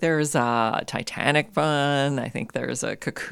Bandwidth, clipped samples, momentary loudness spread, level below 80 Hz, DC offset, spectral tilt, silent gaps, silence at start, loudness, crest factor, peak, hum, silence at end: 15 kHz; under 0.1%; 8 LU; -60 dBFS; under 0.1%; -4.5 dB/octave; none; 0 s; -24 LUFS; 20 dB; -4 dBFS; none; 0 s